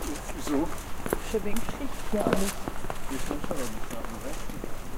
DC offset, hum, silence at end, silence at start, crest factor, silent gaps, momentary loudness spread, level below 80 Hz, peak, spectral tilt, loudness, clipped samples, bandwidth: under 0.1%; none; 0 s; 0 s; 20 dB; none; 10 LU; -36 dBFS; -8 dBFS; -4.5 dB/octave; -33 LUFS; under 0.1%; 16.5 kHz